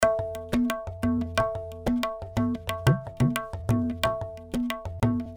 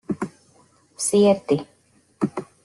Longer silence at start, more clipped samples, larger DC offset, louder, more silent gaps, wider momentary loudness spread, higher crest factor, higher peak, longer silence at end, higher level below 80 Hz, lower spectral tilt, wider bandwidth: about the same, 0 s vs 0.1 s; neither; neither; second, -28 LUFS vs -22 LUFS; neither; second, 6 LU vs 12 LU; about the same, 22 dB vs 18 dB; about the same, -6 dBFS vs -6 dBFS; second, 0 s vs 0.2 s; first, -44 dBFS vs -64 dBFS; first, -6.5 dB/octave vs -5 dB/octave; first, over 20 kHz vs 12.5 kHz